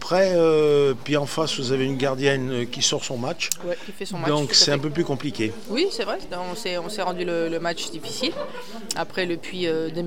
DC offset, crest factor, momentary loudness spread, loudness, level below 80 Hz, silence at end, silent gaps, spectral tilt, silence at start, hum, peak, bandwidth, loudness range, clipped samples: 2%; 22 dB; 12 LU; -23 LUFS; -58 dBFS; 0 s; none; -3.5 dB/octave; 0 s; none; -2 dBFS; 17 kHz; 6 LU; under 0.1%